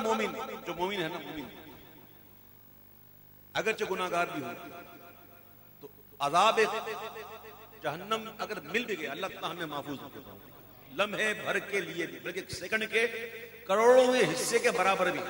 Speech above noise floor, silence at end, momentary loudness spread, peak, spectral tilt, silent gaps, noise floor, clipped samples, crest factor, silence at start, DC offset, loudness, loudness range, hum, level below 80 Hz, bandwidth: 25 dB; 0 s; 24 LU; -12 dBFS; -3 dB/octave; none; -55 dBFS; under 0.1%; 20 dB; 0 s; under 0.1%; -30 LUFS; 8 LU; 50 Hz at -65 dBFS; -68 dBFS; 16.5 kHz